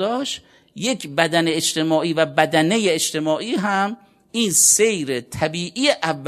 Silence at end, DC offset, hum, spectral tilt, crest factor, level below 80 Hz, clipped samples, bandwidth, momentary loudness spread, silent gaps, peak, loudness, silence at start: 0 s; under 0.1%; none; -2.5 dB/octave; 20 dB; -60 dBFS; under 0.1%; 14 kHz; 12 LU; none; 0 dBFS; -19 LUFS; 0 s